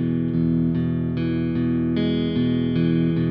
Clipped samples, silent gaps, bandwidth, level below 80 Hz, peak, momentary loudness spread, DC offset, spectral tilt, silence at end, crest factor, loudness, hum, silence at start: under 0.1%; none; 5.2 kHz; -44 dBFS; -10 dBFS; 3 LU; 0.2%; -8 dB/octave; 0 s; 10 dB; -22 LUFS; none; 0 s